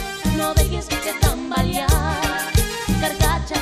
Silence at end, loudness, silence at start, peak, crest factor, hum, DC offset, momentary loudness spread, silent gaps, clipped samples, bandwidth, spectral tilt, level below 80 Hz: 0 s; -20 LUFS; 0 s; -4 dBFS; 16 dB; none; under 0.1%; 3 LU; none; under 0.1%; 15.5 kHz; -4.5 dB/octave; -24 dBFS